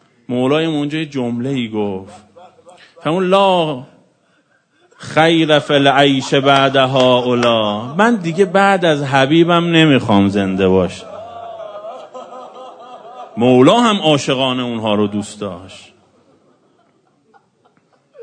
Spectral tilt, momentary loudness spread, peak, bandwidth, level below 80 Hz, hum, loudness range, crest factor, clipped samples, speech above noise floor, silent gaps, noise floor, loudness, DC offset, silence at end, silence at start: -5.5 dB/octave; 20 LU; 0 dBFS; 9.6 kHz; -58 dBFS; none; 8 LU; 16 dB; under 0.1%; 44 dB; none; -58 dBFS; -14 LUFS; under 0.1%; 0 s; 0.3 s